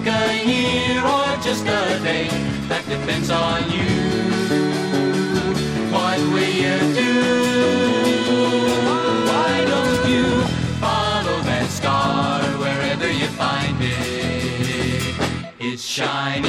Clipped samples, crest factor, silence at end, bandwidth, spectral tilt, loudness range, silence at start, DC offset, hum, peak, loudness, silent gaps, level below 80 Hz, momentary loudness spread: under 0.1%; 14 dB; 0 s; 15 kHz; -5 dB/octave; 3 LU; 0 s; under 0.1%; none; -6 dBFS; -19 LUFS; none; -42 dBFS; 5 LU